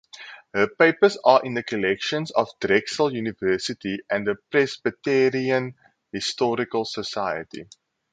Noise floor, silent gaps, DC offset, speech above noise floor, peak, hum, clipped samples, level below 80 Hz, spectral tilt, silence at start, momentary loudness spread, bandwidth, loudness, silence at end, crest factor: -44 dBFS; none; under 0.1%; 21 dB; -2 dBFS; none; under 0.1%; -62 dBFS; -4.5 dB/octave; 0.15 s; 12 LU; 9.4 kHz; -23 LUFS; 0.5 s; 22 dB